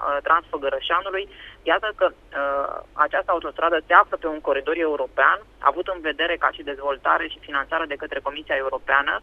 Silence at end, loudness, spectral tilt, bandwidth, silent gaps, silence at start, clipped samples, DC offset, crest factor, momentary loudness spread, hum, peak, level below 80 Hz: 0.05 s; -22 LUFS; -5 dB/octave; 5.6 kHz; none; 0 s; under 0.1%; under 0.1%; 22 dB; 9 LU; none; 0 dBFS; -52 dBFS